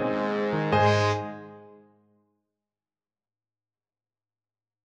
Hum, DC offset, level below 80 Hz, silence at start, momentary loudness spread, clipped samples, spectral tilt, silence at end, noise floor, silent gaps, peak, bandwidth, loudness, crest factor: none; under 0.1%; -62 dBFS; 0 s; 20 LU; under 0.1%; -6 dB/octave; 3.15 s; under -90 dBFS; none; -10 dBFS; 8.6 kHz; -25 LUFS; 20 dB